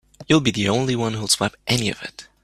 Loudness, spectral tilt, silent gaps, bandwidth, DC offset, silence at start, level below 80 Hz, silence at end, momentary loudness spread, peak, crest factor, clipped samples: -20 LUFS; -4 dB/octave; none; 14.5 kHz; under 0.1%; 0.2 s; -50 dBFS; 0.2 s; 8 LU; -2 dBFS; 20 dB; under 0.1%